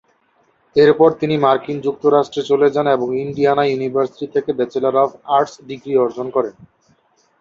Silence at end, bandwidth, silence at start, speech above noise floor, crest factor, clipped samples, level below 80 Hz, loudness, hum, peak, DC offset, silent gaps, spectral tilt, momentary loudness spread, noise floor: 0.75 s; 7.4 kHz; 0.75 s; 43 dB; 16 dB; under 0.1%; -60 dBFS; -17 LUFS; none; 0 dBFS; under 0.1%; none; -7 dB/octave; 8 LU; -60 dBFS